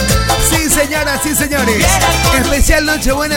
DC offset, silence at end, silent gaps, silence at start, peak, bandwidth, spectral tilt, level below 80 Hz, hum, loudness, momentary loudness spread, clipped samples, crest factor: under 0.1%; 0 s; none; 0 s; 0 dBFS; 17 kHz; -3 dB/octave; -20 dBFS; none; -12 LUFS; 3 LU; under 0.1%; 12 dB